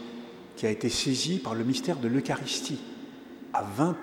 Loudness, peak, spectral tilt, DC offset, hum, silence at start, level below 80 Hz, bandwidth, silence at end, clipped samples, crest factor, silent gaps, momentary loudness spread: -29 LUFS; -10 dBFS; -4.5 dB/octave; under 0.1%; none; 0 s; -62 dBFS; 19 kHz; 0 s; under 0.1%; 20 dB; none; 17 LU